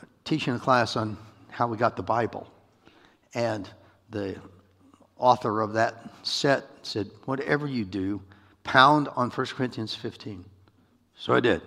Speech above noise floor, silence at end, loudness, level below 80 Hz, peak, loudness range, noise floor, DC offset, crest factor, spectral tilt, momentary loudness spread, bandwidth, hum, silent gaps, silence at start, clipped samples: 36 dB; 0 s; -26 LUFS; -64 dBFS; -2 dBFS; 6 LU; -62 dBFS; under 0.1%; 24 dB; -5.5 dB/octave; 15 LU; 13 kHz; none; none; 0.25 s; under 0.1%